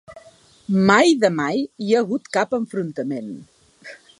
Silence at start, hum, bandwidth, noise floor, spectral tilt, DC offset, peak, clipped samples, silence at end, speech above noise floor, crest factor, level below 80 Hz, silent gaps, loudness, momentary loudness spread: 0.1 s; none; 11.5 kHz; -50 dBFS; -5.5 dB/octave; under 0.1%; 0 dBFS; under 0.1%; 0.25 s; 31 dB; 20 dB; -62 dBFS; none; -20 LUFS; 21 LU